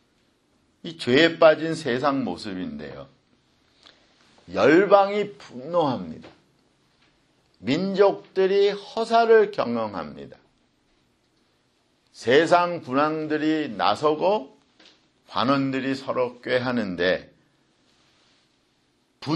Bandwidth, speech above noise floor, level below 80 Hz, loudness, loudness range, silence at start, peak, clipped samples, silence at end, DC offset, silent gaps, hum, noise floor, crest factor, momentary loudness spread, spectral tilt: 11 kHz; 45 dB; -64 dBFS; -22 LUFS; 5 LU; 0.85 s; -2 dBFS; under 0.1%; 0 s; under 0.1%; none; none; -67 dBFS; 22 dB; 17 LU; -5.5 dB/octave